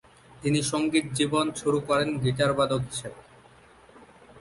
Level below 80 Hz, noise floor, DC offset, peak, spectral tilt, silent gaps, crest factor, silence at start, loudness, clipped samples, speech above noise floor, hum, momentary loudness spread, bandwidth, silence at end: -56 dBFS; -54 dBFS; under 0.1%; -10 dBFS; -5 dB/octave; none; 18 dB; 0.35 s; -26 LUFS; under 0.1%; 28 dB; none; 9 LU; 11.5 kHz; 0 s